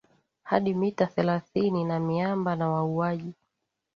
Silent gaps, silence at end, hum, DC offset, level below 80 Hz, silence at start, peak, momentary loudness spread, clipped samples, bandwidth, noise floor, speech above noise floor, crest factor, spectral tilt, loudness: none; 0.65 s; none; under 0.1%; -66 dBFS; 0.45 s; -6 dBFS; 3 LU; under 0.1%; 6.8 kHz; -81 dBFS; 55 dB; 22 dB; -8.5 dB/octave; -27 LUFS